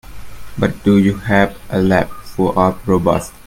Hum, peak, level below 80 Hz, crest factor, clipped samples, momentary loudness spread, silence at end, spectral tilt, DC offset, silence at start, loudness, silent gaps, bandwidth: none; 0 dBFS; -36 dBFS; 16 dB; under 0.1%; 7 LU; 0.15 s; -7 dB/octave; under 0.1%; 0.05 s; -16 LUFS; none; 16.5 kHz